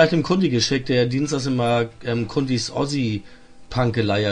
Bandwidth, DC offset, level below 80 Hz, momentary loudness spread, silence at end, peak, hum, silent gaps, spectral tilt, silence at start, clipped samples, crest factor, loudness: 11 kHz; under 0.1%; -48 dBFS; 6 LU; 0 s; -2 dBFS; none; none; -5.5 dB/octave; 0 s; under 0.1%; 18 dB; -21 LUFS